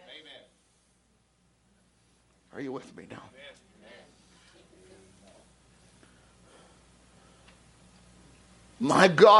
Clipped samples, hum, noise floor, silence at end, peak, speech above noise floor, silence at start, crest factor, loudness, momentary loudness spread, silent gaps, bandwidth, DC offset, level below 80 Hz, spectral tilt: under 0.1%; none; -68 dBFS; 0 s; -4 dBFS; 46 dB; 2.55 s; 26 dB; -25 LUFS; 31 LU; none; 11.5 kHz; under 0.1%; -66 dBFS; -4.5 dB/octave